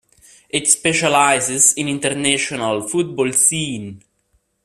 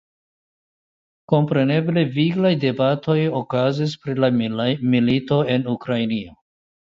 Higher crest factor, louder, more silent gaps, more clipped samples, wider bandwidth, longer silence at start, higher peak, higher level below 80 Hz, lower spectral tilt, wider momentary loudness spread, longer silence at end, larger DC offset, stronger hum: about the same, 18 dB vs 18 dB; first, -16 LUFS vs -20 LUFS; neither; neither; first, 15.5 kHz vs 7.6 kHz; second, 0.55 s vs 1.3 s; about the same, 0 dBFS vs -2 dBFS; about the same, -58 dBFS vs -58 dBFS; second, -2 dB/octave vs -8 dB/octave; first, 10 LU vs 5 LU; about the same, 0.65 s vs 0.6 s; neither; neither